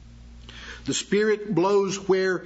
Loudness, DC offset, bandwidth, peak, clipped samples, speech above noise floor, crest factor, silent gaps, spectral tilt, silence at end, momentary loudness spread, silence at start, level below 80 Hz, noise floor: -23 LUFS; under 0.1%; 8 kHz; -10 dBFS; under 0.1%; 22 dB; 14 dB; none; -4.5 dB/octave; 0 s; 18 LU; 0.05 s; -50 dBFS; -44 dBFS